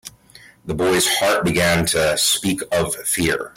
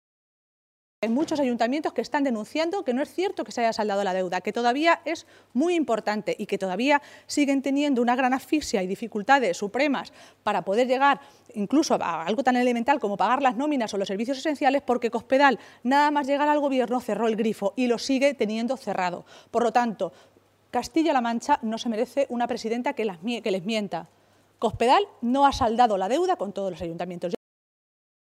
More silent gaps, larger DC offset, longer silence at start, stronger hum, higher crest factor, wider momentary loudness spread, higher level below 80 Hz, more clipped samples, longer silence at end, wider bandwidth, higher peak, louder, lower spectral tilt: neither; neither; second, 0.05 s vs 1 s; neither; second, 12 dB vs 20 dB; second, 5 LU vs 9 LU; first, -46 dBFS vs -58 dBFS; neither; second, 0.05 s vs 1 s; about the same, 16.5 kHz vs 15.5 kHz; about the same, -6 dBFS vs -4 dBFS; first, -18 LUFS vs -25 LUFS; second, -3 dB/octave vs -4.5 dB/octave